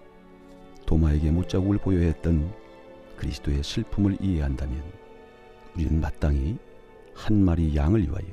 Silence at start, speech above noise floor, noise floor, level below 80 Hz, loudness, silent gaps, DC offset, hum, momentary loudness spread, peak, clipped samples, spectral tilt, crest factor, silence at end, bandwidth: 0.3 s; 25 dB; -49 dBFS; -32 dBFS; -26 LUFS; none; under 0.1%; none; 14 LU; -8 dBFS; under 0.1%; -8 dB/octave; 16 dB; 0 s; 9.8 kHz